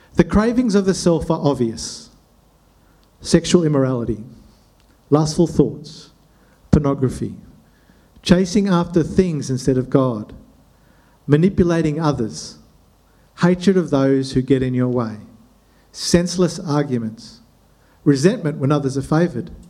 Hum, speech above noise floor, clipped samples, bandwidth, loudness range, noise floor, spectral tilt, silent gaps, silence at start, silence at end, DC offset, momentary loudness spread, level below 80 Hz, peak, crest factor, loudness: none; 36 dB; under 0.1%; 12.5 kHz; 2 LU; -54 dBFS; -6.5 dB/octave; none; 0.15 s; 0.1 s; under 0.1%; 14 LU; -40 dBFS; 0 dBFS; 18 dB; -18 LUFS